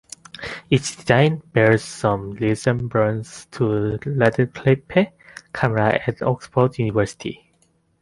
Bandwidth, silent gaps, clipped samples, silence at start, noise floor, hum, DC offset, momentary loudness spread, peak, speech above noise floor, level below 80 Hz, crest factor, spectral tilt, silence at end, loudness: 11.5 kHz; none; under 0.1%; 0.4 s; -62 dBFS; none; under 0.1%; 15 LU; -2 dBFS; 43 dB; -50 dBFS; 18 dB; -6.5 dB/octave; 0.65 s; -20 LUFS